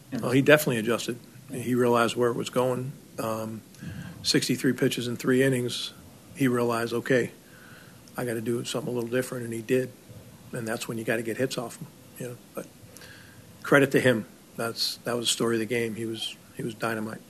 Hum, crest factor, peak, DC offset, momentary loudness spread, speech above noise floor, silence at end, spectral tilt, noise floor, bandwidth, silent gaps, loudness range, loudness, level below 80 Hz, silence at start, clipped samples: none; 24 dB; -4 dBFS; under 0.1%; 18 LU; 22 dB; 0.1 s; -4.5 dB/octave; -49 dBFS; 15.5 kHz; none; 6 LU; -27 LUFS; -66 dBFS; 0.1 s; under 0.1%